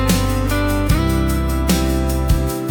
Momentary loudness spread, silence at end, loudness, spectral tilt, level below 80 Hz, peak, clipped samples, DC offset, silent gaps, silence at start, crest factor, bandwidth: 2 LU; 0 s; -18 LUFS; -5.5 dB/octave; -20 dBFS; -4 dBFS; under 0.1%; under 0.1%; none; 0 s; 12 dB; 19 kHz